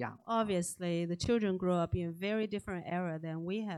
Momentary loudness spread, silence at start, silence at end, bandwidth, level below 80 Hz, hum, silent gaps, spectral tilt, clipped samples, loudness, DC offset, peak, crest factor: 6 LU; 0 s; 0 s; 13 kHz; -58 dBFS; none; none; -6 dB/octave; under 0.1%; -35 LUFS; under 0.1%; -18 dBFS; 16 dB